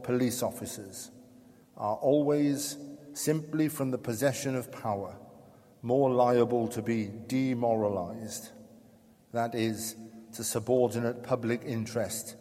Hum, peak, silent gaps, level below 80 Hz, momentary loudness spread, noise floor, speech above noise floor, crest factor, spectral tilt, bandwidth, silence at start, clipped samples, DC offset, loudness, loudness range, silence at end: none; -12 dBFS; none; -70 dBFS; 15 LU; -59 dBFS; 29 dB; 18 dB; -5.5 dB/octave; 16.5 kHz; 0 s; under 0.1%; under 0.1%; -30 LUFS; 4 LU; 0 s